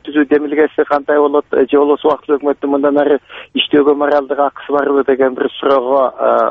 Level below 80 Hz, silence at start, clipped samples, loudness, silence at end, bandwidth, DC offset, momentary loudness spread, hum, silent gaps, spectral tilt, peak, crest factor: -56 dBFS; 0.05 s; under 0.1%; -13 LUFS; 0 s; 4.6 kHz; under 0.1%; 5 LU; none; none; -7 dB/octave; 0 dBFS; 12 dB